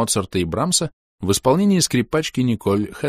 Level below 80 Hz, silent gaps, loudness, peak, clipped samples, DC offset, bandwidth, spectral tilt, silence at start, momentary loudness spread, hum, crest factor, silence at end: -46 dBFS; 0.93-1.18 s; -19 LUFS; -4 dBFS; under 0.1%; under 0.1%; 15.5 kHz; -4.5 dB/octave; 0 s; 6 LU; none; 16 dB; 0 s